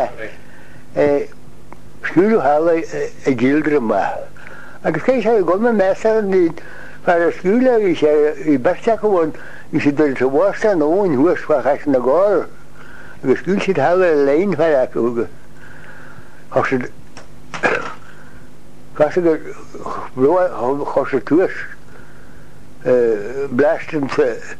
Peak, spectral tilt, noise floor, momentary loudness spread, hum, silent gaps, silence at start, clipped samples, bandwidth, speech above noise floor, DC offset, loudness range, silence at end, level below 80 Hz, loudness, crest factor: 0 dBFS; -7 dB/octave; -43 dBFS; 14 LU; none; none; 0 s; under 0.1%; 11.5 kHz; 27 dB; 4%; 6 LU; 0.05 s; -50 dBFS; -17 LUFS; 16 dB